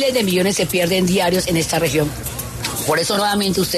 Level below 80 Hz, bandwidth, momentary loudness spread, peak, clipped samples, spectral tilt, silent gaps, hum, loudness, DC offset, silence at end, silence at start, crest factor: -40 dBFS; 14 kHz; 7 LU; -6 dBFS; under 0.1%; -4 dB/octave; none; none; -18 LUFS; under 0.1%; 0 s; 0 s; 12 dB